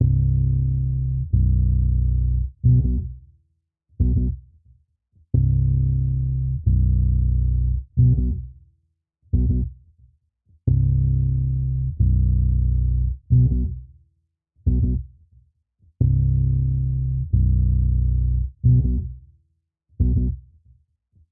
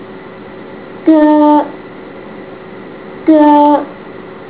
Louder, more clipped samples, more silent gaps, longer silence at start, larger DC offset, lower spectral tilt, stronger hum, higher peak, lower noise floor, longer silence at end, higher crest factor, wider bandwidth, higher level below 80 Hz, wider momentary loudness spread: second, -22 LUFS vs -9 LUFS; second, under 0.1% vs 0.5%; neither; about the same, 0 s vs 0 s; second, under 0.1% vs 0.4%; first, -17.5 dB/octave vs -10 dB/octave; neither; second, -6 dBFS vs 0 dBFS; first, -69 dBFS vs -30 dBFS; first, 0.9 s vs 0 s; about the same, 14 dB vs 12 dB; second, 0.8 kHz vs 4 kHz; first, -24 dBFS vs -54 dBFS; second, 8 LU vs 23 LU